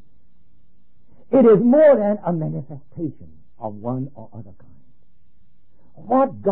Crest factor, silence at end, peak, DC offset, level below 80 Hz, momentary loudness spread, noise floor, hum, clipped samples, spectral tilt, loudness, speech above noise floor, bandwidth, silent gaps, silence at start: 16 dB; 0 s; -6 dBFS; 1%; -58 dBFS; 21 LU; -62 dBFS; none; under 0.1%; -13.5 dB/octave; -18 LUFS; 44 dB; 3.8 kHz; none; 1.3 s